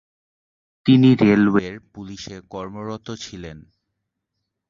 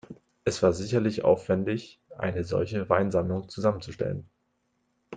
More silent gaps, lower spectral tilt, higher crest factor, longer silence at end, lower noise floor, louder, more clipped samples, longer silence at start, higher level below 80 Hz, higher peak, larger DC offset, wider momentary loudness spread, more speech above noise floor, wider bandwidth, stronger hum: neither; about the same, -7 dB/octave vs -6.5 dB/octave; about the same, 18 dB vs 22 dB; first, 1.1 s vs 0 s; first, -79 dBFS vs -74 dBFS; first, -16 LUFS vs -27 LUFS; neither; first, 0.85 s vs 0.1 s; about the same, -54 dBFS vs -58 dBFS; first, -2 dBFS vs -6 dBFS; neither; first, 23 LU vs 9 LU; first, 60 dB vs 48 dB; second, 7.4 kHz vs 9.4 kHz; neither